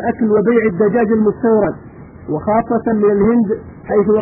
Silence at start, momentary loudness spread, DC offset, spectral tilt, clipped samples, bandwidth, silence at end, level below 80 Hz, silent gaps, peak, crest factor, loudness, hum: 0 s; 10 LU; under 0.1%; -4.5 dB/octave; under 0.1%; 3 kHz; 0 s; -44 dBFS; none; -2 dBFS; 12 dB; -15 LUFS; none